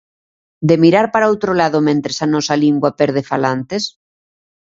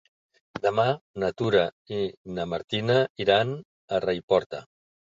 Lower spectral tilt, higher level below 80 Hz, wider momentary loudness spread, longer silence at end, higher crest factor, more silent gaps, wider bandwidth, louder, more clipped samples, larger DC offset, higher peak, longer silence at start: about the same, -5.5 dB/octave vs -6.5 dB/octave; about the same, -56 dBFS vs -58 dBFS; about the same, 9 LU vs 10 LU; first, 0.8 s vs 0.5 s; about the same, 16 dB vs 20 dB; second, none vs 1.01-1.14 s, 1.72-1.85 s, 2.17-2.25 s, 2.64-2.68 s, 3.10-3.15 s, 3.65-3.88 s, 4.23-4.28 s, 4.46-4.50 s; about the same, 7.8 kHz vs 7.6 kHz; first, -15 LUFS vs -26 LUFS; neither; neither; first, 0 dBFS vs -8 dBFS; about the same, 0.6 s vs 0.55 s